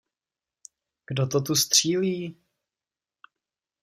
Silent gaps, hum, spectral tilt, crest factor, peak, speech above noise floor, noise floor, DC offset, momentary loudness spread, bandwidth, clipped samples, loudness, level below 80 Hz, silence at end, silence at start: none; none; -3.5 dB/octave; 24 dB; -6 dBFS; over 66 dB; under -90 dBFS; under 0.1%; 14 LU; 15.5 kHz; under 0.1%; -23 LUFS; -70 dBFS; 1.5 s; 1.1 s